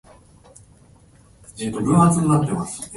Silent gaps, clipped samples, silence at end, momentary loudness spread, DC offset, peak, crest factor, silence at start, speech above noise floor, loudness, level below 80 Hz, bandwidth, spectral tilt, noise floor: none; under 0.1%; 0 s; 14 LU; under 0.1%; -4 dBFS; 18 dB; 1.55 s; 32 dB; -19 LUFS; -48 dBFS; 11.5 kHz; -7 dB/octave; -51 dBFS